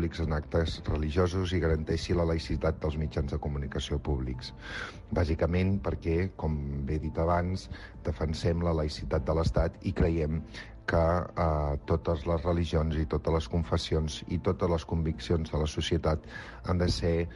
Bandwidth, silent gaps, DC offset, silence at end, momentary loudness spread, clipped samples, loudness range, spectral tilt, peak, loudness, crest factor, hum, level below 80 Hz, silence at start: 11.5 kHz; none; under 0.1%; 0 s; 6 LU; under 0.1%; 2 LU; -7 dB/octave; -14 dBFS; -31 LUFS; 16 dB; none; -36 dBFS; 0 s